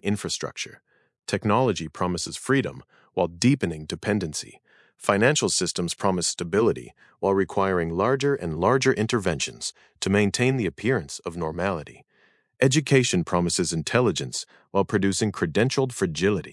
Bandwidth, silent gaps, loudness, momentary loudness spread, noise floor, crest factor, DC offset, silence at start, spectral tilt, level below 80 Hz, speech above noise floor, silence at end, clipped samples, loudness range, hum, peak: 12 kHz; none; -24 LUFS; 10 LU; -64 dBFS; 20 dB; under 0.1%; 0.05 s; -4.5 dB/octave; -58 dBFS; 39 dB; 0 s; under 0.1%; 3 LU; none; -4 dBFS